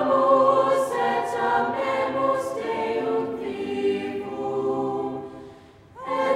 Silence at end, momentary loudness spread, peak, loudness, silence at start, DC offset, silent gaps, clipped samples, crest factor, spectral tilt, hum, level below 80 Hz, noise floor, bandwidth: 0 s; 12 LU; -6 dBFS; -24 LUFS; 0 s; under 0.1%; none; under 0.1%; 18 dB; -5.5 dB/octave; none; -62 dBFS; -47 dBFS; 13.5 kHz